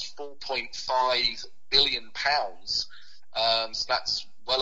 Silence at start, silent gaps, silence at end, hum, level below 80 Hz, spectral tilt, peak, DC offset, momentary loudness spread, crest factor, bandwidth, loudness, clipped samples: 0 s; none; 0 s; none; -56 dBFS; -1 dB/octave; -6 dBFS; 0.9%; 13 LU; 24 dB; 8 kHz; -26 LUFS; under 0.1%